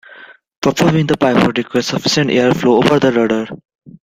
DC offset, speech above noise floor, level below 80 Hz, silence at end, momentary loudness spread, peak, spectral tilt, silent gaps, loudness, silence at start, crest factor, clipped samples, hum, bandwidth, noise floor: under 0.1%; 27 dB; -48 dBFS; 0.25 s; 6 LU; 0 dBFS; -5.5 dB/octave; 0.57-0.62 s, 3.75-3.79 s; -14 LUFS; 0.1 s; 14 dB; under 0.1%; none; 16 kHz; -40 dBFS